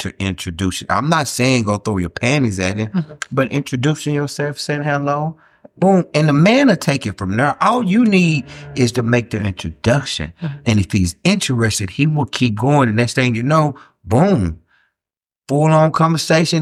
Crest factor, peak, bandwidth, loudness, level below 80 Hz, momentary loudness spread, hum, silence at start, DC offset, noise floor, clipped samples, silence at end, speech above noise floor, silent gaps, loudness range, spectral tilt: 16 dB; -2 dBFS; 14.5 kHz; -16 LUFS; -44 dBFS; 9 LU; none; 0 s; under 0.1%; -90 dBFS; under 0.1%; 0 s; 74 dB; none; 4 LU; -5.5 dB/octave